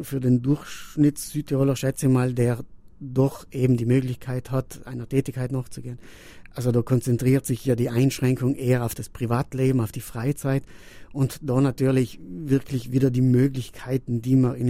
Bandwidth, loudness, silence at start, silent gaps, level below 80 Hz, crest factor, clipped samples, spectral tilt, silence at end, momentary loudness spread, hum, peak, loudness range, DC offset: 16 kHz; -24 LUFS; 0 s; none; -48 dBFS; 16 dB; under 0.1%; -7.5 dB/octave; 0 s; 10 LU; none; -8 dBFS; 3 LU; under 0.1%